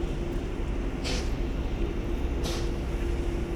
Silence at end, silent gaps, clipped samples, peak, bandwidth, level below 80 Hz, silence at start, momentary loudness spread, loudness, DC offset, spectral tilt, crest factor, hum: 0 s; none; under 0.1%; -16 dBFS; 14 kHz; -30 dBFS; 0 s; 2 LU; -32 LUFS; under 0.1%; -6 dB/octave; 14 dB; none